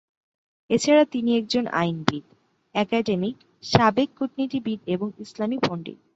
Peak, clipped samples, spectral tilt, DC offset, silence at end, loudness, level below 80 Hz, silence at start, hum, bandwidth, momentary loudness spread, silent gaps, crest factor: -2 dBFS; under 0.1%; -5.5 dB/octave; under 0.1%; 0.2 s; -24 LUFS; -56 dBFS; 0.7 s; none; 8 kHz; 11 LU; none; 22 dB